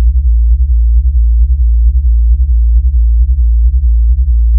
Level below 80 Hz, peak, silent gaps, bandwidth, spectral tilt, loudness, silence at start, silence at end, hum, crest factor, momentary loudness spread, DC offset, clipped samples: -8 dBFS; 0 dBFS; none; 0.2 kHz; -14 dB/octave; -11 LUFS; 0 s; 0 s; none; 6 dB; 1 LU; under 0.1%; under 0.1%